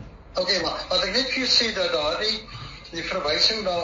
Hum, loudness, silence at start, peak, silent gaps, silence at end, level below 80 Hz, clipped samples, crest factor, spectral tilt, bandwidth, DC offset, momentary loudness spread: none; -22 LUFS; 0 s; -6 dBFS; none; 0 s; -46 dBFS; under 0.1%; 18 dB; -0.5 dB/octave; 7.4 kHz; under 0.1%; 13 LU